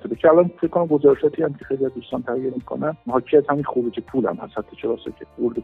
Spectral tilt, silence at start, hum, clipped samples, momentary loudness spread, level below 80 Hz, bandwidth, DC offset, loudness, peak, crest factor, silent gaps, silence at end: -10 dB/octave; 0.05 s; none; under 0.1%; 12 LU; -56 dBFS; 4 kHz; under 0.1%; -21 LUFS; -2 dBFS; 18 dB; none; 0 s